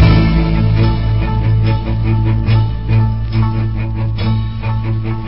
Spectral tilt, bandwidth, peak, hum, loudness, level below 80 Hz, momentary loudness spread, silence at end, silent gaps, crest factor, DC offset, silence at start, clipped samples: -10.5 dB/octave; 5.8 kHz; 0 dBFS; none; -15 LUFS; -20 dBFS; 6 LU; 0 s; none; 14 dB; 3%; 0 s; under 0.1%